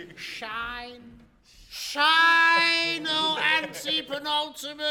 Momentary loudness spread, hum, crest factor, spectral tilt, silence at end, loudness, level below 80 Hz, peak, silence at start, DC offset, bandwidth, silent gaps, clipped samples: 18 LU; none; 18 dB; -1 dB/octave; 0 s; -22 LUFS; -60 dBFS; -8 dBFS; 0 s; under 0.1%; 18 kHz; none; under 0.1%